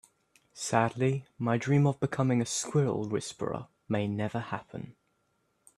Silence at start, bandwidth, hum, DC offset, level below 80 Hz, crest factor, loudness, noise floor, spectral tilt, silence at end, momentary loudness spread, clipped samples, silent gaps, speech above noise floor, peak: 0.55 s; 12.5 kHz; none; under 0.1%; -66 dBFS; 22 dB; -30 LUFS; -75 dBFS; -6 dB/octave; 0.85 s; 12 LU; under 0.1%; none; 45 dB; -8 dBFS